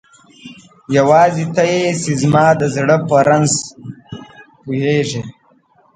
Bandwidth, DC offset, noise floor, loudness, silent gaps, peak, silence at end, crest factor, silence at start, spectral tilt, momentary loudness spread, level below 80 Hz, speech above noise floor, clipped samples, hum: 9.6 kHz; under 0.1%; -53 dBFS; -14 LUFS; none; 0 dBFS; 0.65 s; 16 dB; 0.45 s; -5 dB/octave; 22 LU; -54 dBFS; 40 dB; under 0.1%; none